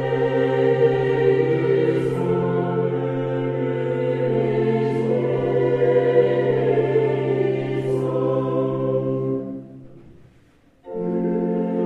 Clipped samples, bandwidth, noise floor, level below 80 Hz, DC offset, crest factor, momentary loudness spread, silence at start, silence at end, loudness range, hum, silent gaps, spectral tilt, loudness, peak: under 0.1%; 7 kHz; -54 dBFS; -56 dBFS; under 0.1%; 16 dB; 6 LU; 0 s; 0 s; 6 LU; none; none; -9 dB/octave; -21 LUFS; -6 dBFS